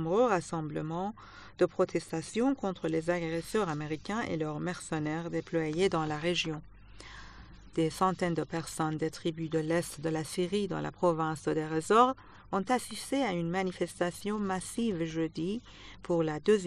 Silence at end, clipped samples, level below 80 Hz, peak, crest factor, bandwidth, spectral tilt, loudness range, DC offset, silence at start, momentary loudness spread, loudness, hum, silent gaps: 0 s; under 0.1%; -58 dBFS; -10 dBFS; 22 dB; 13 kHz; -5.5 dB/octave; 3 LU; under 0.1%; 0 s; 8 LU; -32 LUFS; none; none